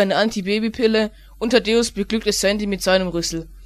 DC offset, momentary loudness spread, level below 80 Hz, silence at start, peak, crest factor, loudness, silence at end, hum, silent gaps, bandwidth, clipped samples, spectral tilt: under 0.1%; 6 LU; -42 dBFS; 0 s; -2 dBFS; 18 dB; -20 LUFS; 0 s; none; none; 14.5 kHz; under 0.1%; -4 dB/octave